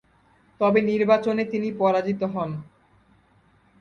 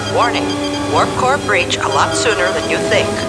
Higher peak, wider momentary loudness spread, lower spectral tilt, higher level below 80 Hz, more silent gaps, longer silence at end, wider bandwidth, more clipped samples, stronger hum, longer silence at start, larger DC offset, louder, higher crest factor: second, -6 dBFS vs -2 dBFS; first, 9 LU vs 3 LU; first, -8 dB/octave vs -3.5 dB/octave; second, -64 dBFS vs -40 dBFS; neither; first, 1.2 s vs 0 s; second, 7 kHz vs 11 kHz; neither; neither; first, 0.6 s vs 0 s; neither; second, -23 LUFS vs -15 LUFS; about the same, 18 dB vs 14 dB